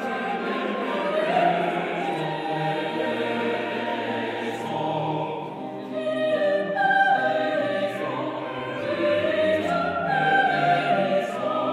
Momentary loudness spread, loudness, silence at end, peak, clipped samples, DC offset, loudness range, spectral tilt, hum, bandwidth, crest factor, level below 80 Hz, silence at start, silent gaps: 9 LU; -24 LUFS; 0 s; -8 dBFS; under 0.1%; under 0.1%; 4 LU; -6 dB/octave; none; 13 kHz; 16 dB; -68 dBFS; 0 s; none